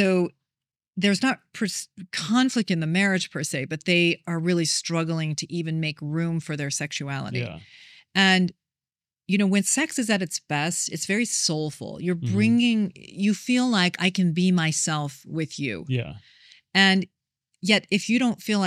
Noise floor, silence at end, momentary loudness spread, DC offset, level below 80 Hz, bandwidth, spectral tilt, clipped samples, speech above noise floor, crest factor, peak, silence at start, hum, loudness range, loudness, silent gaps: under -90 dBFS; 0 s; 10 LU; under 0.1%; -66 dBFS; 14.5 kHz; -4 dB/octave; under 0.1%; over 66 dB; 20 dB; -6 dBFS; 0 s; none; 3 LU; -24 LUFS; none